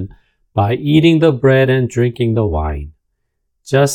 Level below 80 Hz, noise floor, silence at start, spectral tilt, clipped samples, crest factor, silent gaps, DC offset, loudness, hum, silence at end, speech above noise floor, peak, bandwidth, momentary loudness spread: -34 dBFS; -69 dBFS; 0 s; -6.5 dB/octave; under 0.1%; 14 dB; none; under 0.1%; -14 LUFS; none; 0 s; 56 dB; 0 dBFS; 14.5 kHz; 13 LU